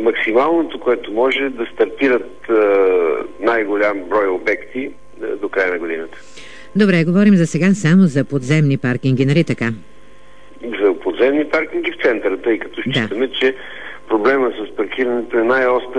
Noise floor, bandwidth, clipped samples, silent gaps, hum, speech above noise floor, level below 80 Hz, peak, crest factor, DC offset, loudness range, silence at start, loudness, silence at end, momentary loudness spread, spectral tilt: -46 dBFS; 10 kHz; under 0.1%; none; none; 30 dB; -52 dBFS; -2 dBFS; 16 dB; 2%; 4 LU; 0 s; -16 LUFS; 0 s; 14 LU; -7 dB/octave